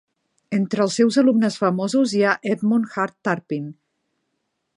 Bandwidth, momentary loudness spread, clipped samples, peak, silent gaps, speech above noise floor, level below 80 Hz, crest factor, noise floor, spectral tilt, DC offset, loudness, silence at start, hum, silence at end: 11 kHz; 9 LU; under 0.1%; -4 dBFS; none; 55 dB; -72 dBFS; 18 dB; -75 dBFS; -5.5 dB/octave; under 0.1%; -20 LUFS; 0.5 s; none; 1.05 s